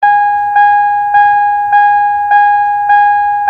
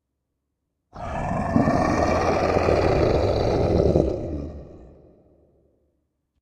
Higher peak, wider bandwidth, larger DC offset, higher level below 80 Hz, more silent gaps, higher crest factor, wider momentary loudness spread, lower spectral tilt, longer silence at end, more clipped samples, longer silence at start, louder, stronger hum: about the same, 0 dBFS vs -2 dBFS; second, 5.2 kHz vs 10.5 kHz; neither; second, -50 dBFS vs -34 dBFS; neither; second, 8 dB vs 20 dB; second, 3 LU vs 13 LU; second, -3 dB/octave vs -7.5 dB/octave; second, 0 s vs 1.55 s; neither; second, 0 s vs 0.95 s; first, -9 LUFS vs -22 LUFS; neither